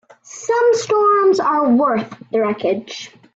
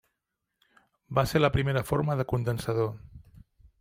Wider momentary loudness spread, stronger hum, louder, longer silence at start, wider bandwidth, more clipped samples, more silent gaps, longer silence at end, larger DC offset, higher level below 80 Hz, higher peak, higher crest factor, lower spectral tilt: first, 15 LU vs 6 LU; neither; first, -16 LUFS vs -28 LUFS; second, 0.3 s vs 1.1 s; second, 8 kHz vs 16 kHz; neither; neither; second, 0.3 s vs 0.65 s; neither; second, -64 dBFS vs -50 dBFS; first, -6 dBFS vs -10 dBFS; second, 12 dB vs 20 dB; second, -4.5 dB/octave vs -6.5 dB/octave